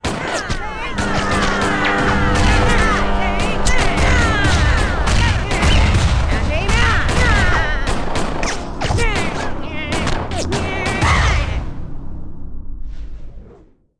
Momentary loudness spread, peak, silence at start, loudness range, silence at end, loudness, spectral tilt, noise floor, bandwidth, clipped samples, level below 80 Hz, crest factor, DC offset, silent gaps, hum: 18 LU; -4 dBFS; 0 s; 5 LU; 0 s; -17 LUFS; -4.5 dB/octave; -46 dBFS; 10.5 kHz; under 0.1%; -20 dBFS; 12 dB; under 0.1%; none; none